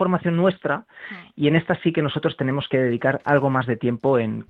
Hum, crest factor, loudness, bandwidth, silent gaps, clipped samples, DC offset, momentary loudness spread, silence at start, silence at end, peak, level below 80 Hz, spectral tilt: none; 18 dB; -22 LUFS; 4.8 kHz; none; under 0.1%; under 0.1%; 7 LU; 0 s; 0.05 s; -4 dBFS; -58 dBFS; -9.5 dB/octave